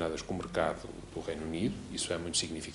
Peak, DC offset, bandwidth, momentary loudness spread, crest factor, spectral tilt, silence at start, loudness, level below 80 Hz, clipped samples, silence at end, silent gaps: -14 dBFS; under 0.1%; 11.5 kHz; 9 LU; 20 dB; -3.5 dB/octave; 0 s; -35 LUFS; -54 dBFS; under 0.1%; 0 s; none